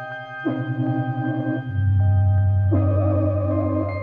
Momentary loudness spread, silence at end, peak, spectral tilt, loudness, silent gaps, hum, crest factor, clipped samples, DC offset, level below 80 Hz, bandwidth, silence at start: 7 LU; 0 s; -10 dBFS; -11.5 dB/octave; -21 LUFS; none; none; 12 dB; under 0.1%; under 0.1%; -44 dBFS; 3.3 kHz; 0 s